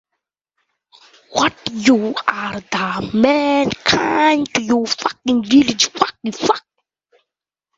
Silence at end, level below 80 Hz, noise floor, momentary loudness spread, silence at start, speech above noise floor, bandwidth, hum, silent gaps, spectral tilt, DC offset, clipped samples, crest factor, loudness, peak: 1.2 s; -52 dBFS; -84 dBFS; 7 LU; 1.3 s; 68 dB; 7.8 kHz; none; none; -3.5 dB/octave; under 0.1%; under 0.1%; 18 dB; -17 LUFS; 0 dBFS